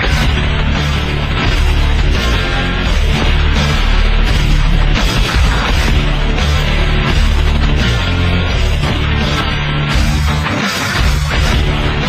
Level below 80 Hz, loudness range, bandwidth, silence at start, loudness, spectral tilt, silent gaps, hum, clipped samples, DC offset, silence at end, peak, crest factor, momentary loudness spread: -14 dBFS; 1 LU; 15 kHz; 0 s; -14 LUFS; -5 dB/octave; none; none; under 0.1%; under 0.1%; 0 s; 0 dBFS; 12 dB; 2 LU